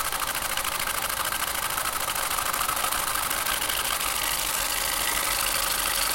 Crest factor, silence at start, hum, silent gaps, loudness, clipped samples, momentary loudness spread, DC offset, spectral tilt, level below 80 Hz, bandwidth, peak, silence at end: 18 dB; 0 s; none; none; -25 LUFS; under 0.1%; 3 LU; under 0.1%; 0 dB/octave; -46 dBFS; 17.5 kHz; -8 dBFS; 0 s